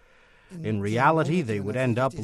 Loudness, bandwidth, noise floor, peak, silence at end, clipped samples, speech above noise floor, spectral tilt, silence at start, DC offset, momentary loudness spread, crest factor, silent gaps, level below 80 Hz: -25 LUFS; 12.5 kHz; -56 dBFS; -6 dBFS; 0 s; under 0.1%; 32 dB; -7 dB/octave; 0.5 s; under 0.1%; 12 LU; 18 dB; none; -58 dBFS